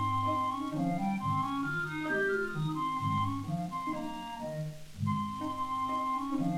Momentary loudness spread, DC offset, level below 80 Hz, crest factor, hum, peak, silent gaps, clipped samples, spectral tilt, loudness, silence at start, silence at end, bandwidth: 8 LU; under 0.1%; -58 dBFS; 12 dB; none; -20 dBFS; none; under 0.1%; -6.5 dB/octave; -34 LUFS; 0 s; 0 s; 16.5 kHz